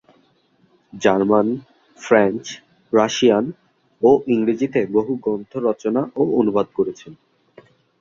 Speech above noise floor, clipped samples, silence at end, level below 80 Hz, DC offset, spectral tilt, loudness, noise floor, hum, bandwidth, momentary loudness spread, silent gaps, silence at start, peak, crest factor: 41 dB; under 0.1%; 0.85 s; -62 dBFS; under 0.1%; -5.5 dB/octave; -19 LUFS; -60 dBFS; none; 7.6 kHz; 14 LU; none; 0.95 s; -2 dBFS; 18 dB